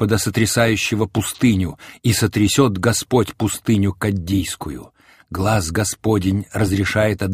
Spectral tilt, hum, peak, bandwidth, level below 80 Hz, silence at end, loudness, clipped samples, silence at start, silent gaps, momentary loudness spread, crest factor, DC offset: -5 dB/octave; none; -2 dBFS; 15.5 kHz; -42 dBFS; 0 s; -19 LUFS; under 0.1%; 0 s; none; 7 LU; 16 dB; under 0.1%